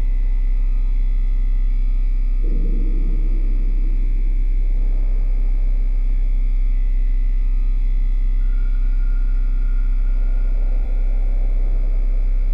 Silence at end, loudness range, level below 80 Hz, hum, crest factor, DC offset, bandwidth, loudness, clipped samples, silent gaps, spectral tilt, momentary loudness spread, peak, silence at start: 0 s; 0 LU; -16 dBFS; none; 6 dB; under 0.1%; 2.5 kHz; -24 LUFS; under 0.1%; none; -9 dB/octave; 0 LU; -10 dBFS; 0 s